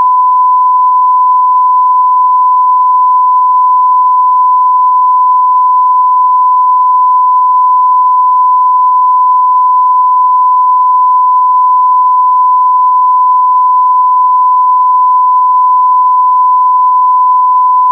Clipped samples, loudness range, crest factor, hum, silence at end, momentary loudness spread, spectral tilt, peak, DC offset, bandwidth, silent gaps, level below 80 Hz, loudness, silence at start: under 0.1%; 0 LU; 4 dB; none; 0 s; 0 LU; -4 dB/octave; -2 dBFS; under 0.1%; 1.2 kHz; none; under -90 dBFS; -7 LUFS; 0 s